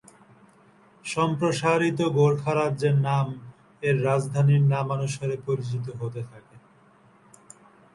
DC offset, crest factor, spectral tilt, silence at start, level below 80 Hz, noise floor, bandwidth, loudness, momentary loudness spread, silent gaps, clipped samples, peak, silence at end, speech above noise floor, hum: under 0.1%; 18 dB; -7 dB/octave; 1.05 s; -62 dBFS; -57 dBFS; 11.5 kHz; -24 LUFS; 12 LU; none; under 0.1%; -8 dBFS; 1.35 s; 33 dB; none